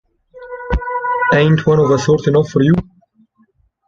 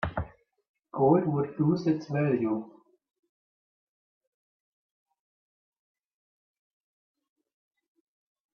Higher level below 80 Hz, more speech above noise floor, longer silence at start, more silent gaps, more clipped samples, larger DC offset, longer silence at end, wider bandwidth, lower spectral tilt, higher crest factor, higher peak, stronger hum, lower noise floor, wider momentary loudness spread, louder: first, -32 dBFS vs -58 dBFS; second, 45 dB vs over 64 dB; first, 0.35 s vs 0 s; second, none vs 0.69-0.74 s; neither; neither; second, 1.05 s vs 5.85 s; first, 7.6 kHz vs 6.6 kHz; second, -7 dB/octave vs -9.5 dB/octave; second, 14 dB vs 22 dB; first, 0 dBFS vs -10 dBFS; neither; second, -57 dBFS vs under -90 dBFS; second, 10 LU vs 13 LU; first, -14 LUFS vs -27 LUFS